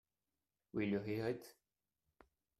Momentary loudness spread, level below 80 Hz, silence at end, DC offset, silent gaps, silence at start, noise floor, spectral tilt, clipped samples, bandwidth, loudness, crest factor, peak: 9 LU; -74 dBFS; 1.1 s; under 0.1%; none; 0.75 s; under -90 dBFS; -7.5 dB/octave; under 0.1%; 13.5 kHz; -42 LUFS; 18 dB; -26 dBFS